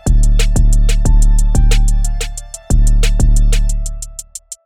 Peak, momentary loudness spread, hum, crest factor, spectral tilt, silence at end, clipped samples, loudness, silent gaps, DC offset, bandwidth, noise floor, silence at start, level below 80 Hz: -2 dBFS; 12 LU; none; 8 dB; -4.5 dB/octave; 0.1 s; under 0.1%; -15 LUFS; none; under 0.1%; 12.5 kHz; -31 dBFS; 0.05 s; -10 dBFS